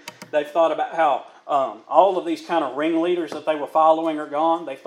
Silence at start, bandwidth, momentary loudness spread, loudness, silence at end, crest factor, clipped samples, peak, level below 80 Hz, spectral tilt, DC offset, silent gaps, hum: 0.05 s; 13.5 kHz; 8 LU; -21 LUFS; 0.1 s; 20 dB; under 0.1%; 0 dBFS; -88 dBFS; -5 dB/octave; under 0.1%; none; none